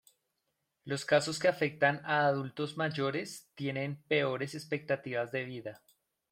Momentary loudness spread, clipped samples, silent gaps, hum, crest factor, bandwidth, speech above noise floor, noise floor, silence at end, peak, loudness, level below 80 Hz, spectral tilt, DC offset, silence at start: 10 LU; under 0.1%; none; none; 22 dB; 16 kHz; 50 dB; -83 dBFS; 0.55 s; -12 dBFS; -33 LUFS; -76 dBFS; -5 dB/octave; under 0.1%; 0.85 s